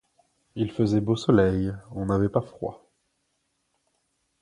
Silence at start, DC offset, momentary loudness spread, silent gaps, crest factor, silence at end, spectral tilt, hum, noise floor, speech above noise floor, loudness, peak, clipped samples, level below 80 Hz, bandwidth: 0.55 s; under 0.1%; 15 LU; none; 20 dB; 1.65 s; -8 dB/octave; none; -75 dBFS; 50 dB; -25 LUFS; -6 dBFS; under 0.1%; -48 dBFS; 11 kHz